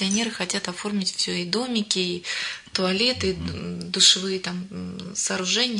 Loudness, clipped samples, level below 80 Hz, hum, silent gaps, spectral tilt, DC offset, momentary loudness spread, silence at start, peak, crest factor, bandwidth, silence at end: -23 LUFS; under 0.1%; -56 dBFS; none; none; -2.5 dB/octave; under 0.1%; 15 LU; 0 s; -4 dBFS; 22 dB; 11 kHz; 0 s